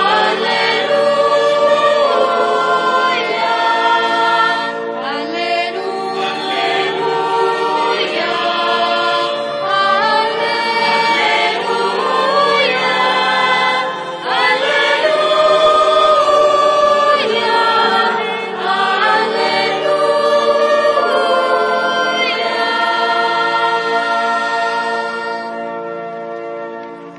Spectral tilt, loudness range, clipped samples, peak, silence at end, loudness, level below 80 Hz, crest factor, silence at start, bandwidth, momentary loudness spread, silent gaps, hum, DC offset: -3 dB/octave; 5 LU; under 0.1%; -2 dBFS; 0 s; -14 LUFS; -60 dBFS; 12 dB; 0 s; 11 kHz; 8 LU; none; none; under 0.1%